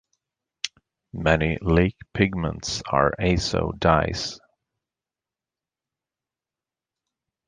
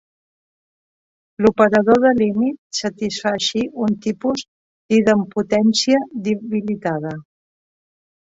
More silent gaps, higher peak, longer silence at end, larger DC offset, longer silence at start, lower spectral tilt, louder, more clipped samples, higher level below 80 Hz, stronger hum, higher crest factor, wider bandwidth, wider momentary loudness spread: second, none vs 2.58-2.70 s, 4.48-4.89 s; about the same, -2 dBFS vs 0 dBFS; first, 3.1 s vs 1.1 s; neither; second, 0.65 s vs 1.4 s; about the same, -5.5 dB/octave vs -5 dB/octave; second, -23 LUFS vs -18 LUFS; neither; first, -38 dBFS vs -56 dBFS; neither; first, 24 dB vs 18 dB; first, 9.8 kHz vs 8 kHz; first, 13 LU vs 10 LU